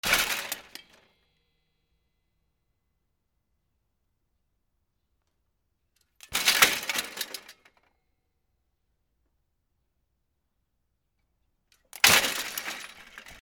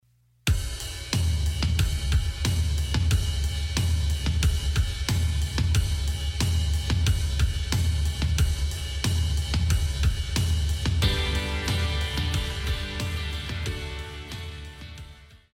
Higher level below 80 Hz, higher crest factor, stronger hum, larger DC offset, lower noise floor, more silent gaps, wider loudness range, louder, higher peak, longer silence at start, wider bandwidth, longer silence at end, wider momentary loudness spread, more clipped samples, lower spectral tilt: second, -62 dBFS vs -28 dBFS; first, 32 dB vs 18 dB; neither; neither; first, -78 dBFS vs -47 dBFS; neither; first, 13 LU vs 3 LU; first, -24 LUFS vs -27 LUFS; first, 0 dBFS vs -8 dBFS; second, 0.05 s vs 0.45 s; first, over 20 kHz vs 16 kHz; second, 0.05 s vs 0.2 s; first, 19 LU vs 8 LU; neither; second, 0.5 dB/octave vs -4.5 dB/octave